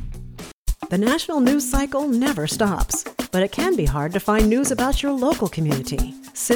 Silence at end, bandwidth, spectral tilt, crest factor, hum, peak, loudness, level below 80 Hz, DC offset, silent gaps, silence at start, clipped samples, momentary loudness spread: 0 s; 19.5 kHz; -4.5 dB/octave; 16 dB; none; -4 dBFS; -21 LUFS; -30 dBFS; under 0.1%; 0.53-0.66 s; 0 s; under 0.1%; 11 LU